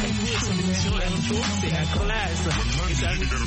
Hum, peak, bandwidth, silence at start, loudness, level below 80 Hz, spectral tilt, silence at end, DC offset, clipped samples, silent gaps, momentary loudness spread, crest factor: none; -12 dBFS; 8.8 kHz; 0 s; -24 LUFS; -30 dBFS; -4.5 dB/octave; 0 s; under 0.1%; under 0.1%; none; 1 LU; 12 dB